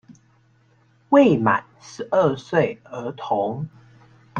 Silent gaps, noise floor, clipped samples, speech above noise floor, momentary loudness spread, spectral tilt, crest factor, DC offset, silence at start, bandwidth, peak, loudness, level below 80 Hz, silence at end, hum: none; -59 dBFS; under 0.1%; 38 dB; 17 LU; -7 dB/octave; 20 dB; under 0.1%; 0.1 s; 7.4 kHz; -2 dBFS; -21 LUFS; -60 dBFS; 0 s; none